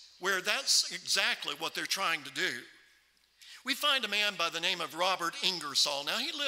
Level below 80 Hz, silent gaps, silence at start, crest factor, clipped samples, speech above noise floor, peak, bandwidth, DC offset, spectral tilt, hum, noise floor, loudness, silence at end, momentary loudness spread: -84 dBFS; none; 0 s; 22 dB; under 0.1%; 35 dB; -10 dBFS; 16 kHz; under 0.1%; 0 dB/octave; none; -67 dBFS; -30 LUFS; 0 s; 7 LU